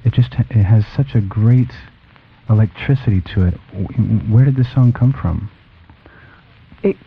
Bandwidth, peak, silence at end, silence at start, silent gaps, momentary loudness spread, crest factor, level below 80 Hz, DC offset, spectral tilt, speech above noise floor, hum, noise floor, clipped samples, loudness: 5 kHz; -2 dBFS; 0.15 s; 0.05 s; none; 10 LU; 14 dB; -36 dBFS; under 0.1%; -11 dB/octave; 33 dB; none; -47 dBFS; under 0.1%; -16 LUFS